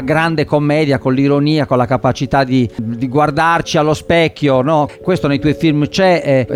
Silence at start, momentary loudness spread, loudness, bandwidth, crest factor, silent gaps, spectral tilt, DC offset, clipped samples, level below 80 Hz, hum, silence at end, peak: 0 s; 3 LU; -14 LUFS; 13.5 kHz; 12 dB; none; -6.5 dB/octave; under 0.1%; under 0.1%; -40 dBFS; none; 0 s; -2 dBFS